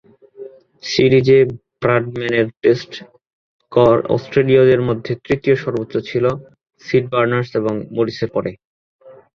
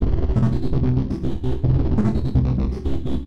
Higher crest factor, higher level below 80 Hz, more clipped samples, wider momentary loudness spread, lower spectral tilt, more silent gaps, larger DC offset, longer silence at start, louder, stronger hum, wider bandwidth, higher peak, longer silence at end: about the same, 16 dB vs 12 dB; second, -50 dBFS vs -24 dBFS; neither; first, 17 LU vs 5 LU; second, -7 dB/octave vs -10 dB/octave; first, 3.33-3.59 s, 8.65-8.99 s vs none; second, under 0.1% vs 5%; first, 0.4 s vs 0 s; first, -17 LUFS vs -22 LUFS; neither; first, 7 kHz vs 6.2 kHz; first, -2 dBFS vs -6 dBFS; first, 0.25 s vs 0 s